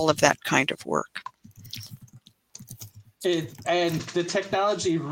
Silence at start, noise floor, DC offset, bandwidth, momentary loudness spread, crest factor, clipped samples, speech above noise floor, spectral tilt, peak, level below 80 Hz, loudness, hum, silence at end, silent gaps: 0 s; -54 dBFS; under 0.1%; 17 kHz; 22 LU; 26 dB; under 0.1%; 29 dB; -4 dB/octave; -2 dBFS; -64 dBFS; -25 LUFS; none; 0 s; none